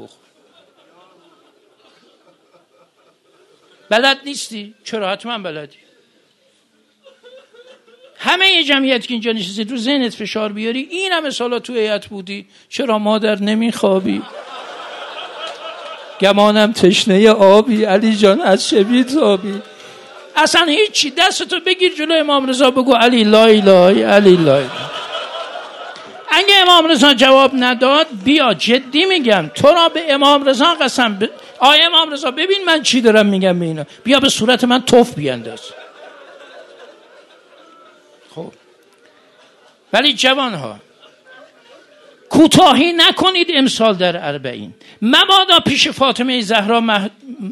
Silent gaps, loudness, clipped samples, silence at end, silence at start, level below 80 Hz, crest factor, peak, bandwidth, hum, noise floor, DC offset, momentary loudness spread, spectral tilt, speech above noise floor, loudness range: none; -12 LUFS; 0.4%; 0 s; 0 s; -58 dBFS; 14 dB; 0 dBFS; 18 kHz; none; -58 dBFS; under 0.1%; 19 LU; -3.5 dB/octave; 45 dB; 9 LU